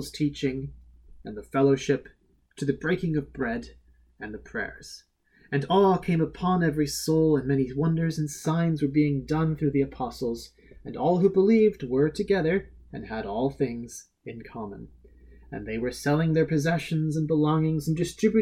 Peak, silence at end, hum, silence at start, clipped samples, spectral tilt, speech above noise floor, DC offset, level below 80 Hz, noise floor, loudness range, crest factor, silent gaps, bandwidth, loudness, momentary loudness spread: -10 dBFS; 0 s; none; 0 s; under 0.1%; -7 dB/octave; 26 dB; under 0.1%; -50 dBFS; -51 dBFS; 7 LU; 16 dB; none; 15 kHz; -26 LUFS; 19 LU